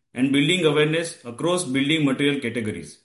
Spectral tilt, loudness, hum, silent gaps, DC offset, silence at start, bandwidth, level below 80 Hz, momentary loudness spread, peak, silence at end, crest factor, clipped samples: -4.5 dB/octave; -22 LUFS; none; none; under 0.1%; 0.15 s; 11.5 kHz; -60 dBFS; 9 LU; -6 dBFS; 0.1 s; 16 dB; under 0.1%